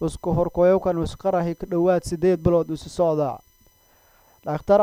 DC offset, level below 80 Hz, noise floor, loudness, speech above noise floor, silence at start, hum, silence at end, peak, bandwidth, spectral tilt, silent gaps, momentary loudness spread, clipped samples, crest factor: under 0.1%; -42 dBFS; -58 dBFS; -22 LUFS; 37 dB; 0 s; none; 0 s; -6 dBFS; 19 kHz; -7.5 dB/octave; none; 11 LU; under 0.1%; 16 dB